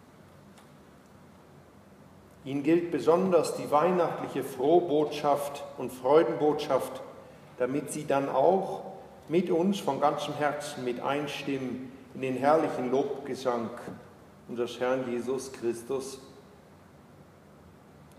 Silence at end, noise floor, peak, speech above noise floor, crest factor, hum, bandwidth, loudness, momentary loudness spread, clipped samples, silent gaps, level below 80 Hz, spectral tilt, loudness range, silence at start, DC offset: 0.15 s; -54 dBFS; -10 dBFS; 26 dB; 20 dB; none; 15.5 kHz; -29 LUFS; 16 LU; under 0.1%; none; -70 dBFS; -5.5 dB/octave; 8 LU; 0.45 s; under 0.1%